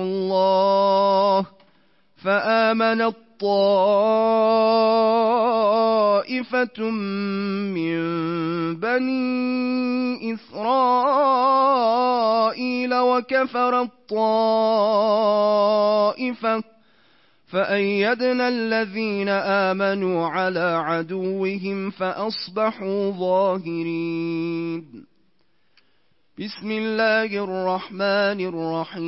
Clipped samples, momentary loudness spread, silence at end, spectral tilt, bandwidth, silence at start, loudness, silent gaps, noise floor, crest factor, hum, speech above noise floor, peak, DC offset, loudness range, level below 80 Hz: under 0.1%; 9 LU; 0 s; -9 dB/octave; 5.8 kHz; 0 s; -21 LUFS; none; -68 dBFS; 12 dB; none; 47 dB; -8 dBFS; 0.1%; 6 LU; -74 dBFS